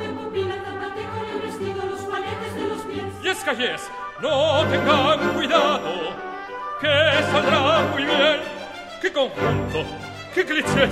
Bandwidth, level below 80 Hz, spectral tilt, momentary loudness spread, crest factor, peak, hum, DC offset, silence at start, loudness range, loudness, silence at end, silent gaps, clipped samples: 15.5 kHz; -50 dBFS; -4.5 dB/octave; 13 LU; 20 dB; -2 dBFS; none; under 0.1%; 0 s; 7 LU; -22 LUFS; 0 s; none; under 0.1%